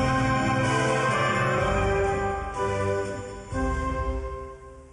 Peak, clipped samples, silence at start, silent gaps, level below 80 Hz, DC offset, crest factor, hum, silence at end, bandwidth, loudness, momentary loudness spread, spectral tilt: -12 dBFS; under 0.1%; 0 s; none; -36 dBFS; under 0.1%; 14 dB; none; 0.05 s; 11.5 kHz; -26 LUFS; 12 LU; -5.5 dB/octave